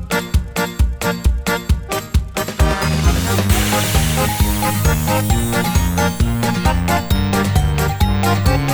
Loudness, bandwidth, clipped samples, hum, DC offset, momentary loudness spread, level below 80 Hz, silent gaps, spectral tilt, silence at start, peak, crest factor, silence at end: -17 LUFS; over 20 kHz; under 0.1%; none; under 0.1%; 5 LU; -22 dBFS; none; -5 dB/octave; 0 s; -2 dBFS; 14 dB; 0 s